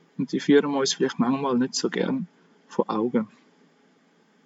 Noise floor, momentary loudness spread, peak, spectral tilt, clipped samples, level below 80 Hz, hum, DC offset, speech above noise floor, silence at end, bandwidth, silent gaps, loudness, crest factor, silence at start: -61 dBFS; 11 LU; -6 dBFS; -4.5 dB/octave; under 0.1%; -90 dBFS; none; under 0.1%; 37 dB; 1.2 s; 8 kHz; none; -24 LUFS; 18 dB; 0.2 s